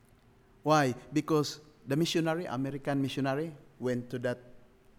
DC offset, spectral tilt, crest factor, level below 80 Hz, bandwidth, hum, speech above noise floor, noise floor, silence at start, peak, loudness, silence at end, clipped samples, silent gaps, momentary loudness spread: under 0.1%; -5.5 dB/octave; 20 dB; -64 dBFS; 17 kHz; none; 31 dB; -61 dBFS; 0.65 s; -12 dBFS; -32 LUFS; 0.4 s; under 0.1%; none; 10 LU